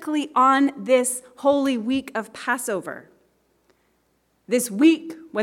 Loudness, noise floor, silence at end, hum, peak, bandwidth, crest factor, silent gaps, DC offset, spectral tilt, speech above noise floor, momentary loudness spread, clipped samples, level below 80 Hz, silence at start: -21 LUFS; -67 dBFS; 0 s; none; -6 dBFS; 17 kHz; 16 dB; none; under 0.1%; -3.5 dB/octave; 46 dB; 12 LU; under 0.1%; -70 dBFS; 0 s